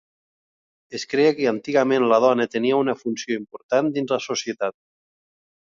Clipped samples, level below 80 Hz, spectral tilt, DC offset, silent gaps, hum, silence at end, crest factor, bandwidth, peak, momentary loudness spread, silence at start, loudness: under 0.1%; -70 dBFS; -4.5 dB/octave; under 0.1%; 3.63-3.69 s; none; 0.95 s; 18 dB; 7.6 kHz; -4 dBFS; 11 LU; 0.9 s; -21 LUFS